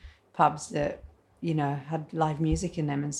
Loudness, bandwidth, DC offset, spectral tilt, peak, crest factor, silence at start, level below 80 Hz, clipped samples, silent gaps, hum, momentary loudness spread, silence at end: -29 LUFS; 11 kHz; under 0.1%; -6 dB/octave; -8 dBFS; 20 dB; 0.05 s; -46 dBFS; under 0.1%; none; none; 10 LU; 0 s